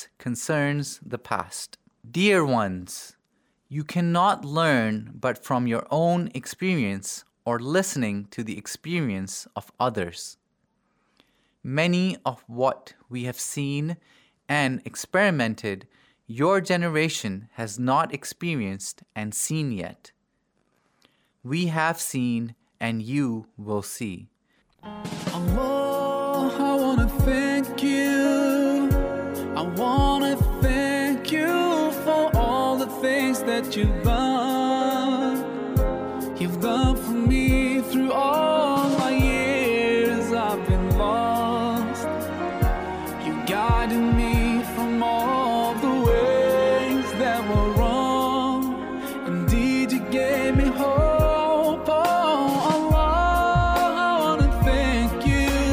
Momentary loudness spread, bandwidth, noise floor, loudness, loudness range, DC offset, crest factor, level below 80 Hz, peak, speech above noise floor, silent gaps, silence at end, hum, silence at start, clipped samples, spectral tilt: 12 LU; 19.5 kHz; -72 dBFS; -23 LUFS; 8 LU; under 0.1%; 16 dB; -32 dBFS; -8 dBFS; 46 dB; none; 0 s; none; 0 s; under 0.1%; -5.5 dB/octave